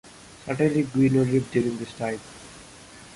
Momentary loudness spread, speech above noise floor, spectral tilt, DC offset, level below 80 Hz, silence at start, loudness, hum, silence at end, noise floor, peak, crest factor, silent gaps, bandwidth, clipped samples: 23 LU; 23 dB; -7 dB/octave; under 0.1%; -56 dBFS; 0.05 s; -24 LUFS; none; 0 s; -46 dBFS; -8 dBFS; 16 dB; none; 11.5 kHz; under 0.1%